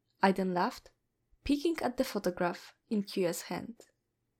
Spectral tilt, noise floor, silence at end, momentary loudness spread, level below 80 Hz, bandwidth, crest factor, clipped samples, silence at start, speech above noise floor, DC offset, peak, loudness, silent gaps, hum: -5.5 dB/octave; -61 dBFS; 0.65 s; 13 LU; -60 dBFS; 17 kHz; 22 dB; under 0.1%; 0.2 s; 28 dB; under 0.1%; -12 dBFS; -33 LUFS; none; none